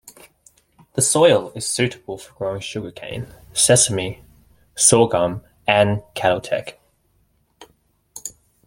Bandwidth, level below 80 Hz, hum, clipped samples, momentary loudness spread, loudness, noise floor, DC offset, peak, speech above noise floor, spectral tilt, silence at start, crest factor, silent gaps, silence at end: 16.5 kHz; -52 dBFS; none; under 0.1%; 20 LU; -18 LUFS; -63 dBFS; under 0.1%; 0 dBFS; 44 dB; -3 dB/octave; 0.05 s; 20 dB; none; 0.35 s